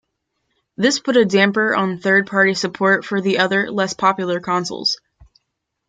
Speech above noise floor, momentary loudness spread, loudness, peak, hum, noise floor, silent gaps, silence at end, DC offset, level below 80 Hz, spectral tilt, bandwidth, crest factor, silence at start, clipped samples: 59 dB; 6 LU; -17 LUFS; -2 dBFS; none; -76 dBFS; none; 0.95 s; under 0.1%; -62 dBFS; -4 dB/octave; 9.4 kHz; 16 dB; 0.8 s; under 0.1%